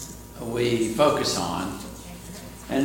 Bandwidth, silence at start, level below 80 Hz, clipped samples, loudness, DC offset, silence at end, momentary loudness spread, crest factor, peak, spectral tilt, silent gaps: 17 kHz; 0 s; -48 dBFS; under 0.1%; -24 LUFS; under 0.1%; 0 s; 18 LU; 20 dB; -6 dBFS; -4.5 dB/octave; none